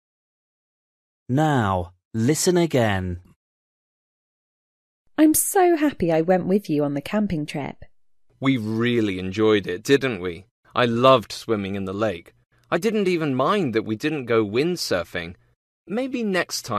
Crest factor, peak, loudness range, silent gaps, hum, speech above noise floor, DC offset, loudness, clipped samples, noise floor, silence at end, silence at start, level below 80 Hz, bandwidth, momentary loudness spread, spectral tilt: 22 dB; -2 dBFS; 3 LU; 2.05-2.11 s, 3.36-5.05 s, 10.51-10.63 s, 15.56-15.85 s; none; 39 dB; under 0.1%; -22 LUFS; under 0.1%; -61 dBFS; 0 s; 1.3 s; -54 dBFS; 14 kHz; 12 LU; -5 dB/octave